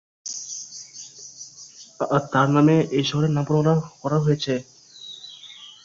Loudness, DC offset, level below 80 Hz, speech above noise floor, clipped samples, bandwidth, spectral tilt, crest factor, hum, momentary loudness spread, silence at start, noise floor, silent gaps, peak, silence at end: -22 LUFS; under 0.1%; -60 dBFS; 25 dB; under 0.1%; 7.6 kHz; -6 dB/octave; 18 dB; none; 21 LU; 0.25 s; -45 dBFS; none; -6 dBFS; 0.15 s